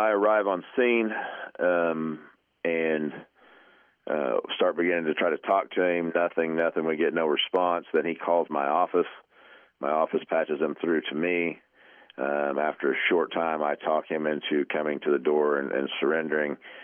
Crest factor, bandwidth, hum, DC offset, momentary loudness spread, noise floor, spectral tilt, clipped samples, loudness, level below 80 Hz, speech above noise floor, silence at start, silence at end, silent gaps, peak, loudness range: 16 dB; 3.6 kHz; none; under 0.1%; 8 LU; -59 dBFS; -8 dB/octave; under 0.1%; -27 LUFS; -82 dBFS; 33 dB; 0 s; 0 s; none; -10 dBFS; 3 LU